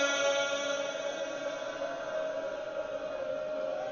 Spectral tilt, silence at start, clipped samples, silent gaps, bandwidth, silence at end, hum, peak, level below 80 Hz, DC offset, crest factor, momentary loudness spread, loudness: -1.5 dB/octave; 0 s; under 0.1%; none; 7.2 kHz; 0 s; none; -18 dBFS; -70 dBFS; under 0.1%; 16 dB; 8 LU; -34 LUFS